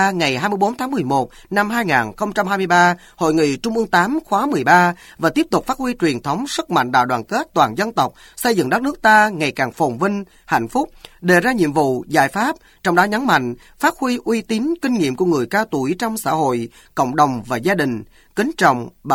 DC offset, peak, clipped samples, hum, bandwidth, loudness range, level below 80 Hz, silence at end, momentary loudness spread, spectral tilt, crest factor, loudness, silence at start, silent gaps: under 0.1%; 0 dBFS; under 0.1%; none; 17.5 kHz; 3 LU; -50 dBFS; 0 s; 8 LU; -5 dB/octave; 18 dB; -18 LUFS; 0 s; none